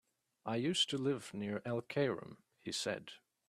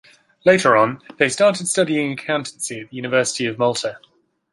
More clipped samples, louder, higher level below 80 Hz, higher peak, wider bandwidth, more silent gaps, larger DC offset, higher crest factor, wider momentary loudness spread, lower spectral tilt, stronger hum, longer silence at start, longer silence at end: neither; second, -38 LUFS vs -19 LUFS; second, -78 dBFS vs -64 dBFS; second, -22 dBFS vs -2 dBFS; first, 14 kHz vs 11.5 kHz; neither; neither; about the same, 18 dB vs 18 dB; first, 16 LU vs 12 LU; about the same, -4 dB/octave vs -3.5 dB/octave; neither; about the same, 0.45 s vs 0.45 s; second, 0.3 s vs 0.55 s